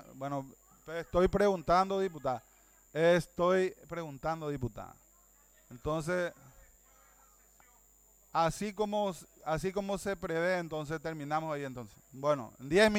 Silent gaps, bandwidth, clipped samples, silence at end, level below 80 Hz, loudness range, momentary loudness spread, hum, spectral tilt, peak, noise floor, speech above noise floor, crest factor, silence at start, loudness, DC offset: none; 18 kHz; under 0.1%; 0 s; -54 dBFS; 9 LU; 14 LU; none; -5.5 dB/octave; -12 dBFS; -64 dBFS; 32 dB; 22 dB; 0 s; -33 LUFS; under 0.1%